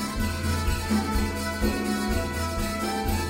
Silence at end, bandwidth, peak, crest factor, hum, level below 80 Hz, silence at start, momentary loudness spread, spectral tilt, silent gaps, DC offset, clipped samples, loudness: 0 s; 16 kHz; -12 dBFS; 14 dB; none; -32 dBFS; 0 s; 3 LU; -5 dB/octave; none; under 0.1%; under 0.1%; -27 LUFS